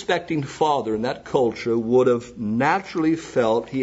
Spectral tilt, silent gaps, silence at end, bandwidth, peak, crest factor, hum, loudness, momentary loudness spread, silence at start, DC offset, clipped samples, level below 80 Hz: -6 dB/octave; none; 0 s; 8 kHz; -6 dBFS; 16 dB; none; -22 LUFS; 7 LU; 0 s; under 0.1%; under 0.1%; -56 dBFS